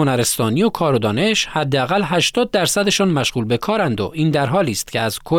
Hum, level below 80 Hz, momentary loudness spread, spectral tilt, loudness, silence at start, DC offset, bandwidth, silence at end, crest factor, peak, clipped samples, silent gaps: none; -48 dBFS; 4 LU; -4.5 dB/octave; -17 LUFS; 0 s; under 0.1%; 18 kHz; 0 s; 12 dB; -6 dBFS; under 0.1%; none